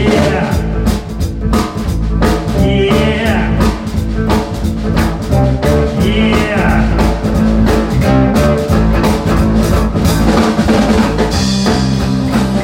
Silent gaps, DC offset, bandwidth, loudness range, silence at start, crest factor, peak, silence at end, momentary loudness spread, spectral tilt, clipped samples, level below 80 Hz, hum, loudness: none; under 0.1%; 16.5 kHz; 2 LU; 0 s; 12 dB; 0 dBFS; 0 s; 5 LU; -6.5 dB/octave; under 0.1%; -18 dBFS; none; -13 LUFS